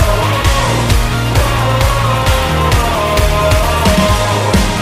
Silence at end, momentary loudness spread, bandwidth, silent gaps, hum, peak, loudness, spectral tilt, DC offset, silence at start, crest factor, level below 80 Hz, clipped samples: 0 s; 2 LU; 16 kHz; none; none; 0 dBFS; -12 LUFS; -5 dB/octave; under 0.1%; 0 s; 12 dB; -18 dBFS; under 0.1%